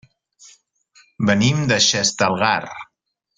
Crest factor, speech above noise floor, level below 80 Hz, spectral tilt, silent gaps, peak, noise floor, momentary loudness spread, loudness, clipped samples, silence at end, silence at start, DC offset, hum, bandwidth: 20 dB; 56 dB; -54 dBFS; -3.5 dB/octave; none; -2 dBFS; -74 dBFS; 10 LU; -17 LUFS; under 0.1%; 0.55 s; 1.2 s; under 0.1%; none; 9.6 kHz